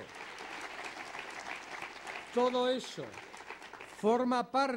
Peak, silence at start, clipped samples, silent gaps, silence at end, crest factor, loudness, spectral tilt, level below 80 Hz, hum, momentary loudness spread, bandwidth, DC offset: -18 dBFS; 0 s; under 0.1%; none; 0 s; 18 dB; -35 LUFS; -4 dB/octave; -76 dBFS; none; 16 LU; 16 kHz; under 0.1%